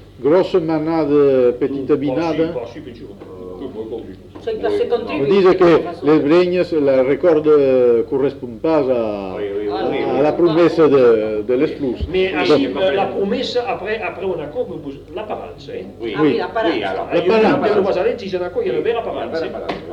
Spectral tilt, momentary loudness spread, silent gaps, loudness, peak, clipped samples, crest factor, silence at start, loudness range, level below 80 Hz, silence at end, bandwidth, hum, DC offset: -7.5 dB/octave; 16 LU; none; -17 LUFS; -2 dBFS; under 0.1%; 14 dB; 0 s; 8 LU; -44 dBFS; 0 s; 8 kHz; none; under 0.1%